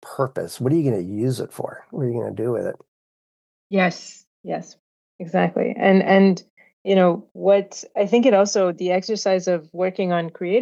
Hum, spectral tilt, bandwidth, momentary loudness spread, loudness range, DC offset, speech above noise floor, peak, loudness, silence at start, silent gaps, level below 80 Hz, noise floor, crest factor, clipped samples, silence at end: none; -6 dB/octave; 12.5 kHz; 15 LU; 8 LU; under 0.1%; over 70 dB; -2 dBFS; -21 LUFS; 0.05 s; 2.88-3.70 s, 4.27-4.44 s, 4.79-5.19 s, 6.50-6.57 s, 6.73-6.85 s, 7.31-7.35 s; -72 dBFS; under -90 dBFS; 18 dB; under 0.1%; 0 s